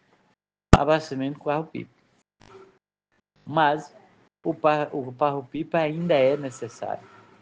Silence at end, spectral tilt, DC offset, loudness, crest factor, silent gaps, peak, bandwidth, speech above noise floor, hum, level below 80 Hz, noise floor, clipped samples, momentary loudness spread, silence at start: 0.4 s; -6.5 dB/octave; under 0.1%; -25 LUFS; 26 dB; none; 0 dBFS; 9.6 kHz; 49 dB; none; -40 dBFS; -73 dBFS; under 0.1%; 14 LU; 0.7 s